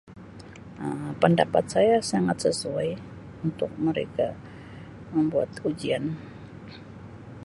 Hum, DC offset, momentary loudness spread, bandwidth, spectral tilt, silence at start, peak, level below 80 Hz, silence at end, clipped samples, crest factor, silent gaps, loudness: none; under 0.1%; 22 LU; 11.5 kHz; -6 dB/octave; 0.1 s; -4 dBFS; -56 dBFS; 0 s; under 0.1%; 22 dB; none; -26 LUFS